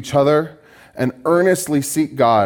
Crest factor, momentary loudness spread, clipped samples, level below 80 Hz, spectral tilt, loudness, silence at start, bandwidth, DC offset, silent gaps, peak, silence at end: 16 dB; 8 LU; under 0.1%; -58 dBFS; -5.5 dB/octave; -17 LUFS; 0 s; 18 kHz; under 0.1%; none; -2 dBFS; 0 s